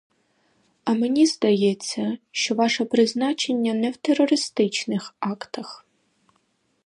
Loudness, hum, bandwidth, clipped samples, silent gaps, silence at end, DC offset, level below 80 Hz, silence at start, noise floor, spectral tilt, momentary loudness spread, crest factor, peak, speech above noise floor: -22 LUFS; none; 11.5 kHz; under 0.1%; none; 1.1 s; under 0.1%; -74 dBFS; 0.85 s; -68 dBFS; -4 dB/octave; 11 LU; 18 dB; -6 dBFS; 46 dB